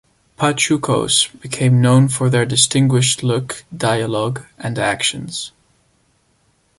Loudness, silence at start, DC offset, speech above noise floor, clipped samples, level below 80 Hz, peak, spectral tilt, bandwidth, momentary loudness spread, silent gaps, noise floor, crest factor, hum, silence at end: -16 LUFS; 0.4 s; under 0.1%; 44 dB; under 0.1%; -52 dBFS; 0 dBFS; -4 dB/octave; 11.5 kHz; 13 LU; none; -60 dBFS; 18 dB; none; 1.3 s